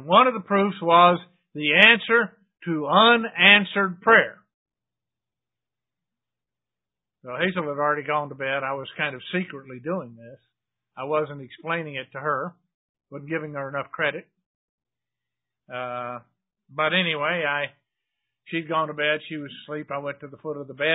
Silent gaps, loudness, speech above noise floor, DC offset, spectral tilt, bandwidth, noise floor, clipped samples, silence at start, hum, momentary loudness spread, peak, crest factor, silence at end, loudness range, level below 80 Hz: 4.54-4.66 s, 12.74-12.95 s, 14.46-14.78 s; -21 LUFS; 67 dB; under 0.1%; -7 dB/octave; 8 kHz; -90 dBFS; under 0.1%; 0 s; none; 19 LU; 0 dBFS; 24 dB; 0 s; 15 LU; -72 dBFS